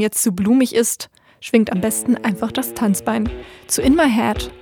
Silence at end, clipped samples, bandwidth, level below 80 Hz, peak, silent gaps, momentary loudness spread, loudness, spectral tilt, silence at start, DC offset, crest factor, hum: 0 s; under 0.1%; 19 kHz; -38 dBFS; -2 dBFS; none; 11 LU; -18 LUFS; -4 dB/octave; 0 s; under 0.1%; 16 dB; none